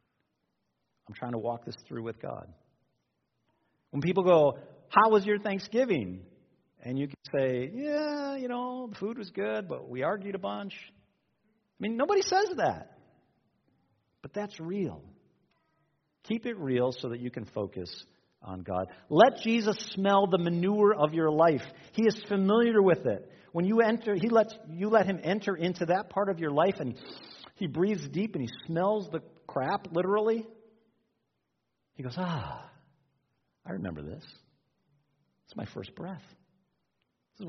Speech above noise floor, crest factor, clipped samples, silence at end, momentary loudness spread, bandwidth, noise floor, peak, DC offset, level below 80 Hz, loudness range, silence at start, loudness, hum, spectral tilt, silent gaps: 52 dB; 26 dB; under 0.1%; 0 s; 18 LU; 6.4 kHz; -81 dBFS; -6 dBFS; under 0.1%; -70 dBFS; 15 LU; 1.1 s; -29 LUFS; none; -5 dB/octave; none